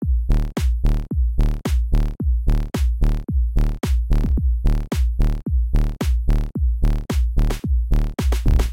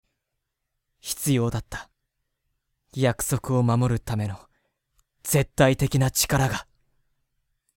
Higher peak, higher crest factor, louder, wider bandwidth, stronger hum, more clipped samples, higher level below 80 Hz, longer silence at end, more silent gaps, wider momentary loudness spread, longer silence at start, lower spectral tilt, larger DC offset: about the same, -6 dBFS vs -4 dBFS; second, 12 dB vs 22 dB; about the same, -22 LUFS vs -24 LUFS; about the same, 16 kHz vs 17 kHz; neither; neither; first, -18 dBFS vs -46 dBFS; second, 0 s vs 1.15 s; neither; second, 2 LU vs 17 LU; second, 0 s vs 1.05 s; first, -7 dB/octave vs -5 dB/octave; first, 0.5% vs under 0.1%